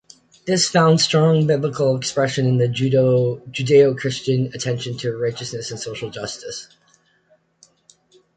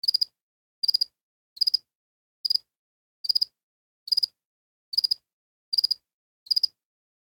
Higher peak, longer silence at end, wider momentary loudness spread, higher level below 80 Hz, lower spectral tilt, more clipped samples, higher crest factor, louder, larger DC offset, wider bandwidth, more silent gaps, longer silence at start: first, -4 dBFS vs -10 dBFS; first, 1.7 s vs 0.6 s; first, 14 LU vs 6 LU; first, -58 dBFS vs -82 dBFS; first, -5 dB/octave vs 3.5 dB/octave; neither; about the same, 16 dB vs 20 dB; first, -19 LUFS vs -25 LUFS; neither; second, 9.4 kHz vs 19.5 kHz; second, none vs 0.41-0.82 s, 1.21-1.56 s, 1.95-2.44 s, 2.76-3.24 s, 3.63-4.06 s, 4.45-4.92 s, 5.33-5.72 s, 6.13-6.46 s; first, 0.45 s vs 0.05 s